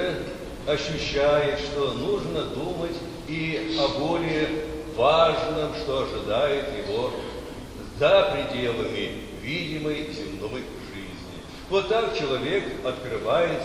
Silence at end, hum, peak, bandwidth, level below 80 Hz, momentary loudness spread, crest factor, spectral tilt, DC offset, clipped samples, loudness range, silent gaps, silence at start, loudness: 0 s; none; -6 dBFS; 14.5 kHz; -44 dBFS; 14 LU; 20 dB; -5 dB/octave; under 0.1%; under 0.1%; 5 LU; none; 0 s; -26 LUFS